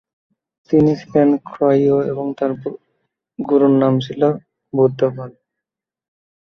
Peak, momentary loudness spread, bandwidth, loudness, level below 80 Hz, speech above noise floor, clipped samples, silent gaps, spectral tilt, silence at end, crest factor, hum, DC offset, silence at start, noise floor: -2 dBFS; 14 LU; 6.4 kHz; -17 LUFS; -56 dBFS; 69 dB; under 0.1%; none; -9 dB/octave; 1.3 s; 16 dB; none; under 0.1%; 0.7 s; -85 dBFS